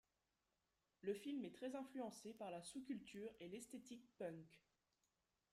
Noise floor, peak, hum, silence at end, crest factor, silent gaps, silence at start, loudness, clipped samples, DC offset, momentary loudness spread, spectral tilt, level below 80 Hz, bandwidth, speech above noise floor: -90 dBFS; -34 dBFS; none; 0.95 s; 20 dB; none; 1.05 s; -53 LUFS; under 0.1%; under 0.1%; 8 LU; -5 dB/octave; -88 dBFS; 15.5 kHz; 37 dB